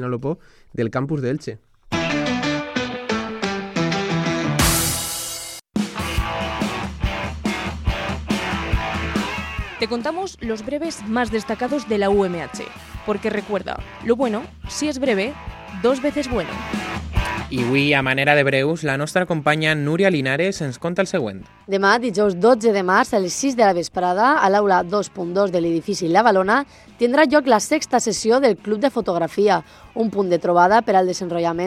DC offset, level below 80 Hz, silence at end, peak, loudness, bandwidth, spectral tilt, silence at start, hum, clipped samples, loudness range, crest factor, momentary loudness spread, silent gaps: under 0.1%; -38 dBFS; 0 s; 0 dBFS; -20 LUFS; 16 kHz; -4.5 dB/octave; 0 s; none; under 0.1%; 7 LU; 20 dB; 11 LU; none